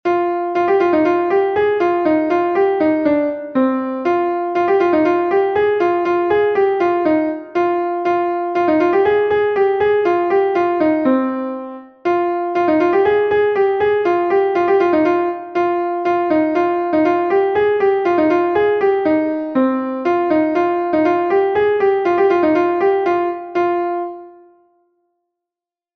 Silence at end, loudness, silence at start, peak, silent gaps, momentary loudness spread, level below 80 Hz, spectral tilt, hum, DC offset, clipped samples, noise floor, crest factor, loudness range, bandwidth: 1.65 s; -16 LUFS; 0.05 s; -2 dBFS; none; 4 LU; -54 dBFS; -7 dB/octave; none; under 0.1%; under 0.1%; -88 dBFS; 14 dB; 1 LU; 6.2 kHz